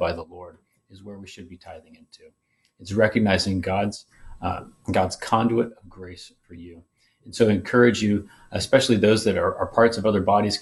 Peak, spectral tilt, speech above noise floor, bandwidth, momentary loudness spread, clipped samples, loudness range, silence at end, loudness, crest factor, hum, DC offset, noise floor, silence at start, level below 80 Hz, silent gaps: -4 dBFS; -5.5 dB/octave; 24 dB; 12 kHz; 24 LU; under 0.1%; 7 LU; 0 s; -22 LUFS; 20 dB; none; under 0.1%; -47 dBFS; 0 s; -52 dBFS; none